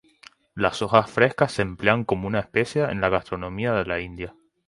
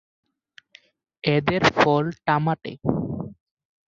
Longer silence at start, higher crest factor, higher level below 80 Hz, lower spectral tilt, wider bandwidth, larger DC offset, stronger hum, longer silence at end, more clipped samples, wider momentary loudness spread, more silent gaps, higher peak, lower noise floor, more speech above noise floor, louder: second, 0.55 s vs 1.25 s; about the same, 22 dB vs 22 dB; about the same, -48 dBFS vs -52 dBFS; about the same, -6 dB/octave vs -6.5 dB/octave; first, 11.5 kHz vs 7.6 kHz; neither; neither; second, 0.35 s vs 0.65 s; neither; about the same, 11 LU vs 12 LU; neither; about the same, -2 dBFS vs -2 dBFS; about the same, -53 dBFS vs -56 dBFS; second, 30 dB vs 34 dB; about the same, -23 LUFS vs -22 LUFS